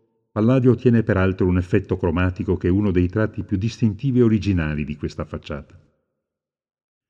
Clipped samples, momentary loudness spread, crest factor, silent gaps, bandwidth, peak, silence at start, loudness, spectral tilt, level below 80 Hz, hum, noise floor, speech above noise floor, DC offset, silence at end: under 0.1%; 13 LU; 18 dB; none; 7.4 kHz; -4 dBFS; 0.35 s; -20 LUFS; -9 dB/octave; -40 dBFS; none; -85 dBFS; 65 dB; under 0.1%; 1.45 s